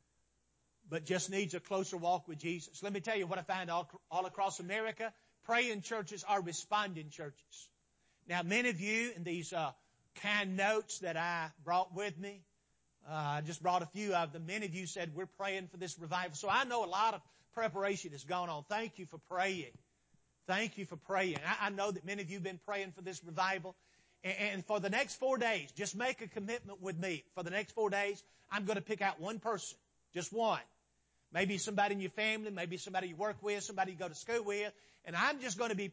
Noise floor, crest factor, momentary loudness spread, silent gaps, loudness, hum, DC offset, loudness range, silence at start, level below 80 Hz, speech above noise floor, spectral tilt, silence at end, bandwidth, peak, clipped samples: -79 dBFS; 20 dB; 10 LU; none; -38 LUFS; none; under 0.1%; 2 LU; 0.85 s; -82 dBFS; 40 dB; -3.5 dB/octave; 0 s; 8 kHz; -20 dBFS; under 0.1%